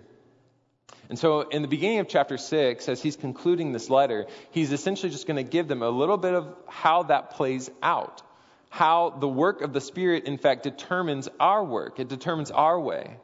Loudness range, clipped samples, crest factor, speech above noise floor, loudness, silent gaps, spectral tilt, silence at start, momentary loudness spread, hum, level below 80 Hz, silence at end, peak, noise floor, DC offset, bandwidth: 2 LU; under 0.1%; 20 dB; 40 dB; -26 LUFS; none; -5.5 dB/octave; 1.1 s; 8 LU; none; -76 dBFS; 0.05 s; -6 dBFS; -66 dBFS; under 0.1%; 7.8 kHz